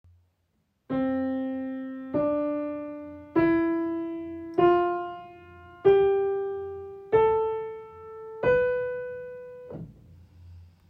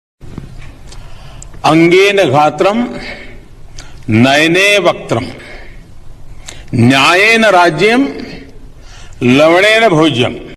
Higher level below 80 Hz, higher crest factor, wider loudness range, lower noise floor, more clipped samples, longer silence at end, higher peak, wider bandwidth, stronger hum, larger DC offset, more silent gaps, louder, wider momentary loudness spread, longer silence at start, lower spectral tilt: second, -58 dBFS vs -36 dBFS; first, 18 dB vs 12 dB; about the same, 6 LU vs 4 LU; first, -73 dBFS vs -31 dBFS; neither; first, 0.25 s vs 0 s; second, -8 dBFS vs 0 dBFS; second, 5 kHz vs 13.5 kHz; neither; neither; neither; second, -26 LUFS vs -9 LUFS; about the same, 20 LU vs 20 LU; first, 0.9 s vs 0.25 s; first, -9 dB/octave vs -5 dB/octave